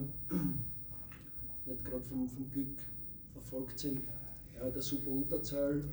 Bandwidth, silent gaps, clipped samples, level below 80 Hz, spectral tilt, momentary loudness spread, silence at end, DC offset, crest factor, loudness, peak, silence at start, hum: over 20 kHz; none; under 0.1%; -56 dBFS; -6.5 dB/octave; 10 LU; 0 s; under 0.1%; 16 dB; -39 LUFS; -24 dBFS; 0 s; none